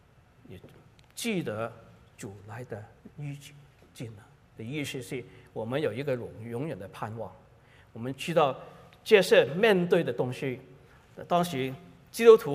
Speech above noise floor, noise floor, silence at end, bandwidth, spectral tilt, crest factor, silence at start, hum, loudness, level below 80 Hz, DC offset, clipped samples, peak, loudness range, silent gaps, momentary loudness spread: 29 dB; -57 dBFS; 0 s; 15.5 kHz; -5.5 dB/octave; 24 dB; 0.5 s; none; -27 LUFS; -66 dBFS; under 0.1%; under 0.1%; -4 dBFS; 14 LU; none; 22 LU